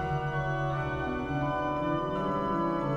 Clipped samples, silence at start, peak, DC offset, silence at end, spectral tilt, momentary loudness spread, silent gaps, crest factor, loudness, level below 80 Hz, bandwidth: under 0.1%; 0 s; -16 dBFS; under 0.1%; 0 s; -8 dB/octave; 2 LU; none; 14 dB; -31 LUFS; -46 dBFS; 7.4 kHz